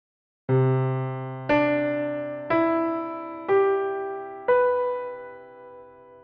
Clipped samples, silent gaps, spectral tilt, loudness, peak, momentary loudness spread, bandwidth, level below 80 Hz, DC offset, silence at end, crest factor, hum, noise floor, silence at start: under 0.1%; none; -7 dB/octave; -25 LUFS; -10 dBFS; 17 LU; 5.2 kHz; -62 dBFS; under 0.1%; 0.05 s; 16 dB; none; -47 dBFS; 0.5 s